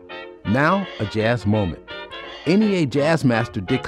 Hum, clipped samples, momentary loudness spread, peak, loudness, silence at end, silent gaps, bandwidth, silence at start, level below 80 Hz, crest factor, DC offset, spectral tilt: none; under 0.1%; 15 LU; -6 dBFS; -20 LUFS; 0 s; none; 12 kHz; 0 s; -50 dBFS; 14 dB; under 0.1%; -7 dB/octave